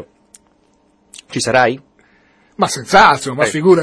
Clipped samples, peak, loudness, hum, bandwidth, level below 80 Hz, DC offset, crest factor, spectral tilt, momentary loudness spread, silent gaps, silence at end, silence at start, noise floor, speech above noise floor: 0.1%; 0 dBFS; -13 LUFS; none; 11 kHz; -50 dBFS; under 0.1%; 16 dB; -4 dB/octave; 12 LU; none; 0 s; 0 s; -56 dBFS; 43 dB